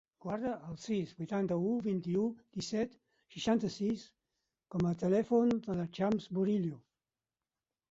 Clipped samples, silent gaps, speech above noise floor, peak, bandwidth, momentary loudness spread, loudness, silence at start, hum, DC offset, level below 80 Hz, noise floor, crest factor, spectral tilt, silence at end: under 0.1%; none; over 56 dB; -18 dBFS; 7.8 kHz; 11 LU; -35 LUFS; 0.25 s; none; under 0.1%; -68 dBFS; under -90 dBFS; 18 dB; -7 dB/octave; 1.1 s